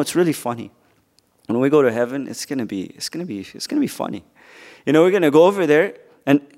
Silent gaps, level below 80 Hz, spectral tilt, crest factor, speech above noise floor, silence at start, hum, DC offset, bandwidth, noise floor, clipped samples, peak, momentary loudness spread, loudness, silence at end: none; -68 dBFS; -5.5 dB/octave; 18 dB; 42 dB; 0 s; none; under 0.1%; 16 kHz; -61 dBFS; under 0.1%; 0 dBFS; 15 LU; -19 LUFS; 0.15 s